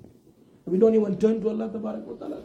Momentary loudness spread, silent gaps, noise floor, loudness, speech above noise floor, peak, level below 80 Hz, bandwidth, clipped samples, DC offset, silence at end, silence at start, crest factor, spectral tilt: 15 LU; none; -56 dBFS; -24 LUFS; 32 dB; -8 dBFS; -62 dBFS; 8.2 kHz; under 0.1%; under 0.1%; 0 s; 0.65 s; 18 dB; -9 dB/octave